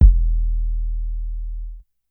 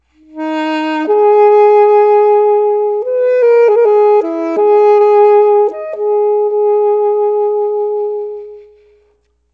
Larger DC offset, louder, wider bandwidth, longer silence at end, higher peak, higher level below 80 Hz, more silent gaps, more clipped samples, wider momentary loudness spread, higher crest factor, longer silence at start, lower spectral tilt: neither; second, -25 LUFS vs -11 LUFS; second, 0.5 kHz vs 5.2 kHz; second, 0.3 s vs 0.95 s; about the same, 0 dBFS vs 0 dBFS; first, -18 dBFS vs -62 dBFS; neither; neither; first, 16 LU vs 10 LU; first, 18 dB vs 10 dB; second, 0 s vs 0.35 s; first, -12.5 dB/octave vs -4.5 dB/octave